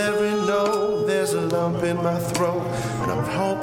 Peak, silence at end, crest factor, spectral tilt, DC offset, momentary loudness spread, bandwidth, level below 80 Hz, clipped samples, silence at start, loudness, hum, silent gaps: -8 dBFS; 0 s; 14 dB; -5.5 dB/octave; under 0.1%; 4 LU; 17 kHz; -50 dBFS; under 0.1%; 0 s; -23 LUFS; none; none